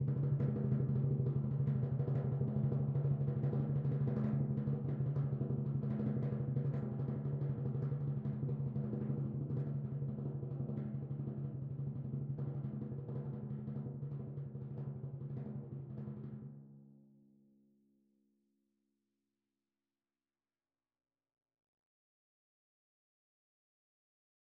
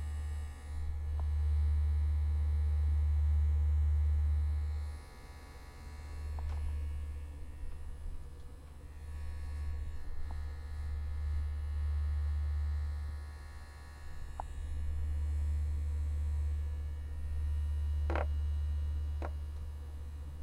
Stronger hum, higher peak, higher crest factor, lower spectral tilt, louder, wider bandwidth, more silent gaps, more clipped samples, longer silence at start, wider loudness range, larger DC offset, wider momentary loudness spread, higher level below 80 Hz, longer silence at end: neither; second, -24 dBFS vs -20 dBFS; about the same, 16 dB vs 14 dB; first, -12.5 dB/octave vs -7.5 dB/octave; about the same, -39 LUFS vs -37 LUFS; second, 2.4 kHz vs 4.5 kHz; neither; neither; about the same, 0 s vs 0 s; about the same, 12 LU vs 11 LU; neither; second, 10 LU vs 17 LU; second, -66 dBFS vs -36 dBFS; first, 7.65 s vs 0 s